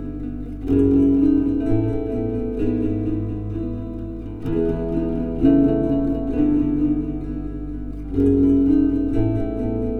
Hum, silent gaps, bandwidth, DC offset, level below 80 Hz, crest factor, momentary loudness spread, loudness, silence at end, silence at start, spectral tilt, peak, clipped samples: 50 Hz at -35 dBFS; none; 4 kHz; under 0.1%; -32 dBFS; 14 dB; 14 LU; -21 LUFS; 0 s; 0 s; -11 dB/octave; -6 dBFS; under 0.1%